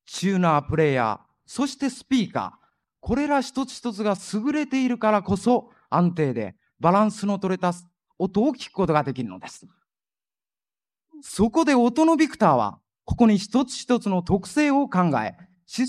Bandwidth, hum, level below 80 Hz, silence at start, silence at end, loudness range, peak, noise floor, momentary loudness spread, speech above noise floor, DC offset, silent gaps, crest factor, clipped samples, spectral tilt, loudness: 12.5 kHz; none; -50 dBFS; 0.1 s; 0 s; 6 LU; -4 dBFS; under -90 dBFS; 13 LU; over 68 dB; under 0.1%; none; 18 dB; under 0.1%; -6 dB/octave; -23 LUFS